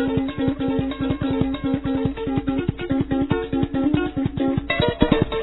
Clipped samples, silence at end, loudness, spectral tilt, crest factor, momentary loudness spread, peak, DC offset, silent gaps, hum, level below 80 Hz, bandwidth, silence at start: under 0.1%; 0 s; -23 LUFS; -10.5 dB/octave; 22 dB; 5 LU; 0 dBFS; under 0.1%; none; none; -36 dBFS; 4.1 kHz; 0 s